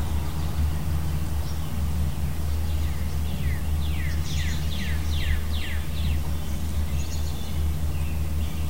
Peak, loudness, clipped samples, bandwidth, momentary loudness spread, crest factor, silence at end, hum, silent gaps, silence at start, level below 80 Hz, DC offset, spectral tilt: -10 dBFS; -29 LUFS; under 0.1%; 16 kHz; 2 LU; 14 dB; 0 s; none; none; 0 s; -28 dBFS; 4%; -5.5 dB/octave